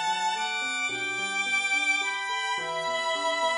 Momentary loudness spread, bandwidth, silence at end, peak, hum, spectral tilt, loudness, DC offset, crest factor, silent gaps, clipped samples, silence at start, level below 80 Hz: 5 LU; 11.5 kHz; 0 s; -14 dBFS; none; 0 dB/octave; -26 LUFS; under 0.1%; 14 dB; none; under 0.1%; 0 s; -76 dBFS